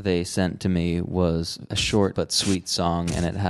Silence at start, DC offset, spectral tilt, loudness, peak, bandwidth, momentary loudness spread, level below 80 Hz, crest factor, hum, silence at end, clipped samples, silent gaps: 0 s; under 0.1%; -5 dB/octave; -24 LUFS; -6 dBFS; 12.5 kHz; 4 LU; -38 dBFS; 16 dB; none; 0 s; under 0.1%; none